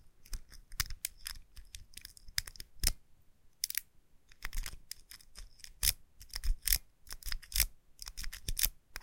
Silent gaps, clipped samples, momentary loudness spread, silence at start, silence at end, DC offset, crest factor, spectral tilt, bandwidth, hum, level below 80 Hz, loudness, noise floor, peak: none; under 0.1%; 20 LU; 0.05 s; 0 s; under 0.1%; 32 dB; 0 dB/octave; 17 kHz; none; -44 dBFS; -37 LUFS; -61 dBFS; -6 dBFS